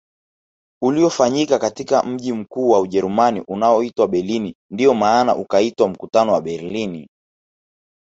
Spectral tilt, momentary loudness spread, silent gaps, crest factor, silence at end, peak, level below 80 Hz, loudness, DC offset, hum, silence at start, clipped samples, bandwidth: -5.5 dB/octave; 9 LU; 4.55-4.69 s; 16 dB; 0.95 s; -2 dBFS; -58 dBFS; -18 LUFS; under 0.1%; none; 0.8 s; under 0.1%; 8 kHz